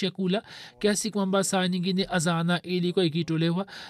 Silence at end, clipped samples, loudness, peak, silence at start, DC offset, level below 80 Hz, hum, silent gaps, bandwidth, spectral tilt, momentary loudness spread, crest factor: 0 s; under 0.1%; -26 LUFS; -12 dBFS; 0 s; under 0.1%; -62 dBFS; none; none; 13.5 kHz; -5 dB/octave; 4 LU; 14 dB